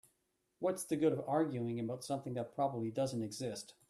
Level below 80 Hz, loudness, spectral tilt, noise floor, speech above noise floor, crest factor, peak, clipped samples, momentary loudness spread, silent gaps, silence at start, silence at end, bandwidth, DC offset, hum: -76 dBFS; -38 LUFS; -6 dB/octave; -81 dBFS; 44 dB; 18 dB; -20 dBFS; under 0.1%; 7 LU; none; 0.6 s; 0.2 s; 14 kHz; under 0.1%; none